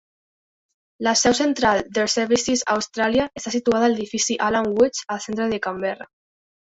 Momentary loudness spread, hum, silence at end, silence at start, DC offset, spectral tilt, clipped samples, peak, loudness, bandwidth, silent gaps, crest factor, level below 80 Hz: 7 LU; none; 0.7 s; 1 s; under 0.1%; -3 dB/octave; under 0.1%; -4 dBFS; -21 LUFS; 8.4 kHz; none; 18 dB; -54 dBFS